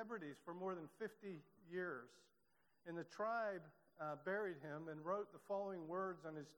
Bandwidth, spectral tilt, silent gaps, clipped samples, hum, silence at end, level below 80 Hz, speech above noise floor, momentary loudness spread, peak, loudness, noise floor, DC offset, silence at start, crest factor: 19 kHz; -7 dB/octave; none; under 0.1%; none; 0.05 s; under -90 dBFS; 34 dB; 10 LU; -32 dBFS; -48 LUFS; -82 dBFS; under 0.1%; 0 s; 18 dB